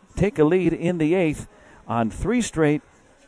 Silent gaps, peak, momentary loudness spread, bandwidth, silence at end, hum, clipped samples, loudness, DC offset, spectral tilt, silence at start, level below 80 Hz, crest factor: none; -6 dBFS; 8 LU; 11 kHz; 0.5 s; none; under 0.1%; -22 LUFS; under 0.1%; -6.5 dB/octave; 0.15 s; -40 dBFS; 18 dB